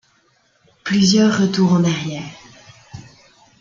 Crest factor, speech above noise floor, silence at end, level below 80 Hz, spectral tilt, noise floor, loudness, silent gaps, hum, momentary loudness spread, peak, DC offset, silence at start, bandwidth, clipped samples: 16 dB; 44 dB; 0.6 s; -56 dBFS; -5.5 dB/octave; -59 dBFS; -16 LUFS; none; none; 22 LU; -2 dBFS; under 0.1%; 0.85 s; 7.4 kHz; under 0.1%